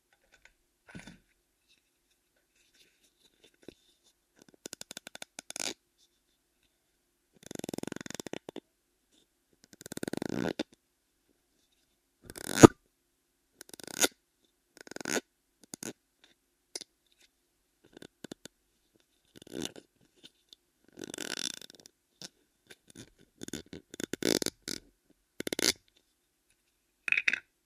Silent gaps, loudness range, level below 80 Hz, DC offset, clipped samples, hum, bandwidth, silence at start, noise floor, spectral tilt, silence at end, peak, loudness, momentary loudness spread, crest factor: none; 21 LU; -60 dBFS; under 0.1%; under 0.1%; none; 15.5 kHz; 0.95 s; -77 dBFS; -4 dB/octave; 0.25 s; 0 dBFS; -31 LUFS; 22 LU; 36 dB